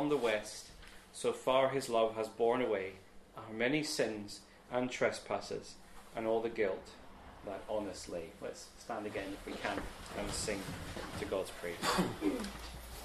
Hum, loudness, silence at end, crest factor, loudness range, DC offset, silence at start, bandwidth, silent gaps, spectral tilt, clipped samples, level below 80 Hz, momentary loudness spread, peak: none; -37 LUFS; 0 s; 22 dB; 7 LU; under 0.1%; 0 s; 14 kHz; none; -4 dB/octave; under 0.1%; -58 dBFS; 17 LU; -16 dBFS